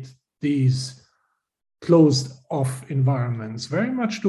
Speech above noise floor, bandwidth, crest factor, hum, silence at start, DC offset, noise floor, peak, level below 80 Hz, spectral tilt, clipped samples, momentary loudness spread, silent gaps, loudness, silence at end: 51 dB; 12 kHz; 18 dB; none; 0 s; under 0.1%; -71 dBFS; -6 dBFS; -62 dBFS; -6.5 dB/octave; under 0.1%; 13 LU; none; -22 LUFS; 0 s